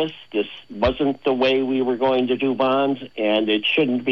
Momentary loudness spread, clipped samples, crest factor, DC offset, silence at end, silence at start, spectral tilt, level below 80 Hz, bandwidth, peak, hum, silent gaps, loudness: 6 LU; under 0.1%; 16 dB; 0.3%; 0 s; 0 s; -7 dB/octave; -48 dBFS; 6.4 kHz; -6 dBFS; none; none; -21 LUFS